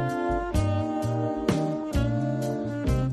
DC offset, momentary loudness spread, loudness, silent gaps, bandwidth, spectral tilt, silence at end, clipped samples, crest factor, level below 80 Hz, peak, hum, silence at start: under 0.1%; 2 LU; -27 LUFS; none; 13.5 kHz; -7.5 dB/octave; 0 s; under 0.1%; 16 dB; -36 dBFS; -10 dBFS; none; 0 s